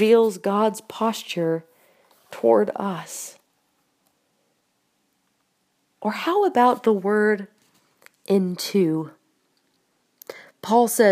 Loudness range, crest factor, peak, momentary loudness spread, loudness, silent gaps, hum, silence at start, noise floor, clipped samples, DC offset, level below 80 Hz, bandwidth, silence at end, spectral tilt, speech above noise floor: 9 LU; 18 dB; -4 dBFS; 20 LU; -22 LUFS; none; none; 0 s; -70 dBFS; under 0.1%; under 0.1%; -80 dBFS; 15.5 kHz; 0 s; -5 dB/octave; 50 dB